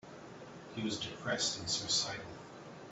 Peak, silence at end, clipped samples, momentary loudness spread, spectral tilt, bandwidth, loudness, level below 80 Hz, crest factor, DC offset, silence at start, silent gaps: -20 dBFS; 0 s; under 0.1%; 19 LU; -2 dB/octave; 8.2 kHz; -35 LUFS; -68 dBFS; 20 dB; under 0.1%; 0.05 s; none